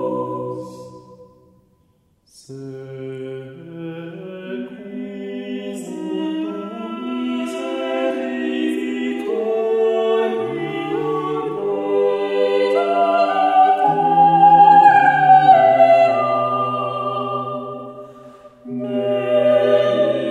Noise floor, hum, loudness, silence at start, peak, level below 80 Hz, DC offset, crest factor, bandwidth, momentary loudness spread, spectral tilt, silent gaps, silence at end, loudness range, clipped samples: -60 dBFS; none; -16 LUFS; 0 s; 0 dBFS; -68 dBFS; under 0.1%; 16 dB; 10.5 kHz; 20 LU; -6.5 dB/octave; none; 0 s; 21 LU; under 0.1%